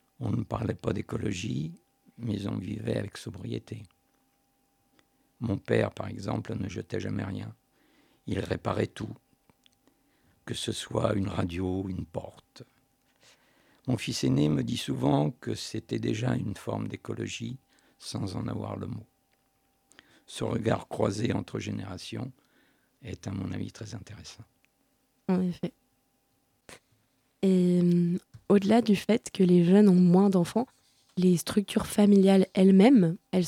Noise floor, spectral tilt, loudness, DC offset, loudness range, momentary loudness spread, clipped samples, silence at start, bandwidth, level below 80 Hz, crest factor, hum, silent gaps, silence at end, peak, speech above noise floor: -72 dBFS; -7 dB/octave; -28 LUFS; under 0.1%; 14 LU; 19 LU; under 0.1%; 0.2 s; 14.5 kHz; -58 dBFS; 20 dB; none; none; 0 s; -8 dBFS; 45 dB